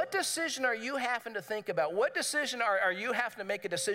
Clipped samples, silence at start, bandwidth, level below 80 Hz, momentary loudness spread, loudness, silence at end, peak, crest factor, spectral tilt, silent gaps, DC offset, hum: under 0.1%; 0 s; 16 kHz; -86 dBFS; 6 LU; -32 LUFS; 0 s; -14 dBFS; 18 dB; -1.5 dB/octave; none; under 0.1%; none